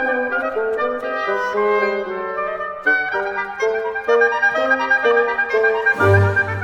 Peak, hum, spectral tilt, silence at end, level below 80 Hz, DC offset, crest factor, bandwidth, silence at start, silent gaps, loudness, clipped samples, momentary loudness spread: -2 dBFS; none; -6.5 dB/octave; 0 s; -54 dBFS; under 0.1%; 16 dB; 10 kHz; 0 s; none; -18 LUFS; under 0.1%; 9 LU